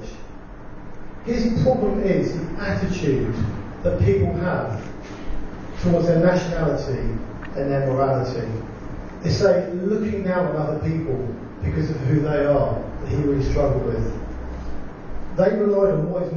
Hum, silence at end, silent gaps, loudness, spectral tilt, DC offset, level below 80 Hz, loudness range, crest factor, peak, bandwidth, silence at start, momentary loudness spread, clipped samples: none; 0 s; none; -22 LUFS; -8 dB/octave; under 0.1%; -34 dBFS; 2 LU; 16 dB; -6 dBFS; 7.2 kHz; 0 s; 17 LU; under 0.1%